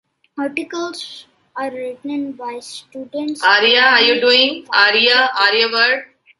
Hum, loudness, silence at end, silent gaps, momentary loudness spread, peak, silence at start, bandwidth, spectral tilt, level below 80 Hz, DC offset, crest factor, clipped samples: none; -13 LUFS; 0.35 s; none; 20 LU; 0 dBFS; 0.35 s; 11.5 kHz; -1.5 dB/octave; -68 dBFS; under 0.1%; 16 dB; under 0.1%